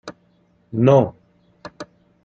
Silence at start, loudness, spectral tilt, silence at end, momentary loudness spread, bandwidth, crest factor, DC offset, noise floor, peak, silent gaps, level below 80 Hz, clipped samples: 0.05 s; -18 LUFS; -8.5 dB/octave; 0.4 s; 25 LU; 7.4 kHz; 20 dB; under 0.1%; -59 dBFS; -2 dBFS; none; -58 dBFS; under 0.1%